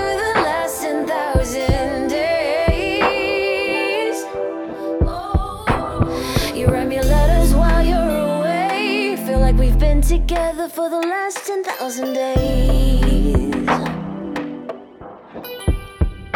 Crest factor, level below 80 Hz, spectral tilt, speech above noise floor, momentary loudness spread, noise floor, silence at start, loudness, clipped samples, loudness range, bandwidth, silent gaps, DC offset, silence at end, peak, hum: 16 dB; -20 dBFS; -5.5 dB/octave; 21 dB; 9 LU; -38 dBFS; 0 s; -19 LUFS; under 0.1%; 3 LU; 17.5 kHz; none; under 0.1%; 0 s; -2 dBFS; none